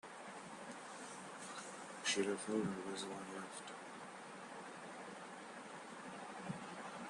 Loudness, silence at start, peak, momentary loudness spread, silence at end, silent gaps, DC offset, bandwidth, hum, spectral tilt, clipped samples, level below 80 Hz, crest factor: -46 LUFS; 0.05 s; -24 dBFS; 12 LU; 0 s; none; under 0.1%; 12 kHz; none; -3.5 dB/octave; under 0.1%; -84 dBFS; 22 dB